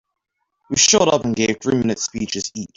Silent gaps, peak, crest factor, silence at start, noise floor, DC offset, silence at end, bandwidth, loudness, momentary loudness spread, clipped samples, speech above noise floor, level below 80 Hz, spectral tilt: none; -2 dBFS; 18 dB; 0.7 s; -76 dBFS; under 0.1%; 0.1 s; 8.2 kHz; -18 LUFS; 12 LU; under 0.1%; 57 dB; -52 dBFS; -3 dB/octave